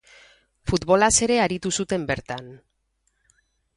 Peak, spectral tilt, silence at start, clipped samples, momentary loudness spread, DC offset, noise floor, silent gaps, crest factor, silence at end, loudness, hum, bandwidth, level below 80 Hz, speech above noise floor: -4 dBFS; -3.5 dB/octave; 0.65 s; under 0.1%; 17 LU; under 0.1%; -71 dBFS; none; 20 dB; 1.2 s; -21 LUFS; none; 11.5 kHz; -46 dBFS; 49 dB